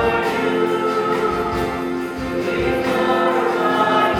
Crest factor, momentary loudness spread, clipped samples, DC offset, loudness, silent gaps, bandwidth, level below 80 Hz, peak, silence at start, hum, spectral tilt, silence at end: 14 dB; 6 LU; under 0.1%; under 0.1%; -19 LUFS; none; 17 kHz; -42 dBFS; -6 dBFS; 0 s; none; -5.5 dB/octave; 0 s